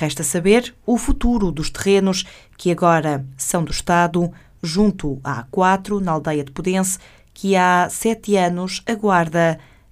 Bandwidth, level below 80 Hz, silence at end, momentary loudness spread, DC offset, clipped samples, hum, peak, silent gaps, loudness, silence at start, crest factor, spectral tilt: 15.5 kHz; -34 dBFS; 0.3 s; 9 LU; under 0.1%; under 0.1%; none; 0 dBFS; none; -19 LUFS; 0 s; 18 dB; -5 dB/octave